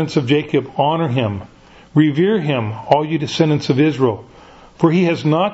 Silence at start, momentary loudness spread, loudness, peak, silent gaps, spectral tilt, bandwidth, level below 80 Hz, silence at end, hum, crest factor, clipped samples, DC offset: 0 s; 6 LU; -17 LUFS; 0 dBFS; none; -7 dB/octave; 8 kHz; -54 dBFS; 0 s; none; 16 dB; under 0.1%; under 0.1%